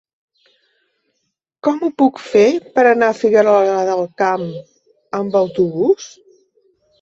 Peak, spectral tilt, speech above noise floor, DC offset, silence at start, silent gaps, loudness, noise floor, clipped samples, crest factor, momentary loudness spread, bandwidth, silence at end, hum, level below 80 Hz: -2 dBFS; -6 dB/octave; 58 dB; under 0.1%; 1.65 s; none; -15 LUFS; -72 dBFS; under 0.1%; 16 dB; 11 LU; 7.8 kHz; 0.95 s; none; -62 dBFS